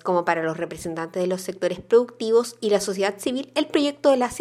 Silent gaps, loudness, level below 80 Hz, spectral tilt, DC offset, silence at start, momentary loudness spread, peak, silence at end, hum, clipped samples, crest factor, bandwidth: none; -23 LUFS; -58 dBFS; -4.5 dB/octave; under 0.1%; 0.05 s; 8 LU; -4 dBFS; 0 s; none; under 0.1%; 18 dB; 15 kHz